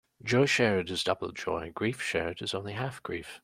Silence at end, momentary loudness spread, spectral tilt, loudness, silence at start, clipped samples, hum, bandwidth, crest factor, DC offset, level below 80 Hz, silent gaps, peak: 0.05 s; 11 LU; -4.5 dB/octave; -30 LUFS; 0.25 s; under 0.1%; none; 16 kHz; 20 dB; under 0.1%; -62 dBFS; none; -10 dBFS